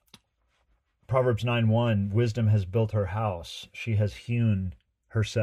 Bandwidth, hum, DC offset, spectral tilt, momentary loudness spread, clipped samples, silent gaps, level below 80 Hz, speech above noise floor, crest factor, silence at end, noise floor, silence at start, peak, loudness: 9.8 kHz; none; under 0.1%; -7.5 dB/octave; 9 LU; under 0.1%; none; -52 dBFS; 46 dB; 16 dB; 0 s; -72 dBFS; 1.1 s; -12 dBFS; -27 LUFS